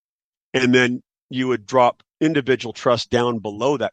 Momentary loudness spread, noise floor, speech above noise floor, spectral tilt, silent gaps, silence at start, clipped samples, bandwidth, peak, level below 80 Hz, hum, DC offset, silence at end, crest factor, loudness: 8 LU; under -90 dBFS; over 71 dB; -5 dB/octave; 1.22-1.29 s; 0.55 s; under 0.1%; 8.8 kHz; -2 dBFS; -60 dBFS; none; under 0.1%; 0.05 s; 18 dB; -20 LUFS